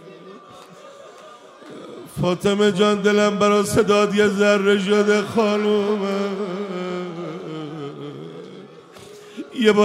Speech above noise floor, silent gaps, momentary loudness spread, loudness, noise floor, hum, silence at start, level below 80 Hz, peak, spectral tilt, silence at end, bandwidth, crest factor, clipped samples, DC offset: 25 dB; none; 21 LU; -19 LUFS; -43 dBFS; none; 0 s; -58 dBFS; -4 dBFS; -5 dB/octave; 0 s; 15.5 kHz; 18 dB; under 0.1%; under 0.1%